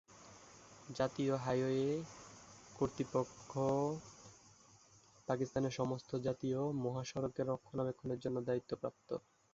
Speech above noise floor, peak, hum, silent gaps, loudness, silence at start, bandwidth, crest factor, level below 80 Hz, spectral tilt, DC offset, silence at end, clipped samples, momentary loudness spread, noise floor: 27 dB; -20 dBFS; none; none; -39 LUFS; 0.1 s; 7.8 kHz; 20 dB; -68 dBFS; -7 dB/octave; under 0.1%; 0.35 s; under 0.1%; 21 LU; -66 dBFS